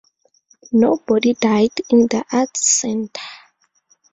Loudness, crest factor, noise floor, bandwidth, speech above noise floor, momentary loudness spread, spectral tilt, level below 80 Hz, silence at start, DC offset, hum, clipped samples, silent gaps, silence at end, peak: -17 LUFS; 18 dB; -60 dBFS; 8.4 kHz; 44 dB; 11 LU; -3.5 dB/octave; -60 dBFS; 0.7 s; under 0.1%; none; under 0.1%; none; 0.75 s; -2 dBFS